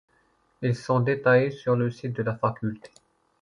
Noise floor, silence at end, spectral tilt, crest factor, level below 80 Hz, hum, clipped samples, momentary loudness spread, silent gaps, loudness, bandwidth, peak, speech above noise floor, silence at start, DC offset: -66 dBFS; 0.65 s; -8 dB/octave; 18 dB; -62 dBFS; none; under 0.1%; 12 LU; none; -25 LUFS; 10.5 kHz; -8 dBFS; 41 dB; 0.6 s; under 0.1%